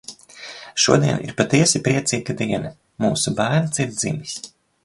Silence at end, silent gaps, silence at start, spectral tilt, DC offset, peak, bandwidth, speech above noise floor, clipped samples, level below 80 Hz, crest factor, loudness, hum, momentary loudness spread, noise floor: 0.35 s; none; 0.1 s; -4 dB/octave; under 0.1%; 0 dBFS; 11.5 kHz; 20 dB; under 0.1%; -54 dBFS; 20 dB; -20 LUFS; none; 19 LU; -39 dBFS